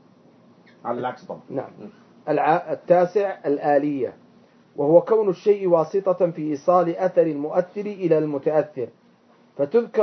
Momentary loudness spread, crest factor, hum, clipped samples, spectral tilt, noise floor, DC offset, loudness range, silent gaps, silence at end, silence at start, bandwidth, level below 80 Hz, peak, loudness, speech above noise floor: 14 LU; 20 dB; none; under 0.1%; -8.5 dB/octave; -56 dBFS; under 0.1%; 3 LU; none; 0 s; 0.85 s; 6.4 kHz; -78 dBFS; -2 dBFS; -22 LUFS; 35 dB